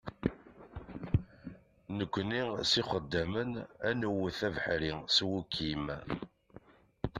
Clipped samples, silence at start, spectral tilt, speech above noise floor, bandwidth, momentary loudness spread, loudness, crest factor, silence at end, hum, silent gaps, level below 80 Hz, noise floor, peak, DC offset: under 0.1%; 0.05 s; -5 dB/octave; 24 dB; 13.5 kHz; 20 LU; -34 LUFS; 22 dB; 0 s; none; none; -54 dBFS; -58 dBFS; -14 dBFS; under 0.1%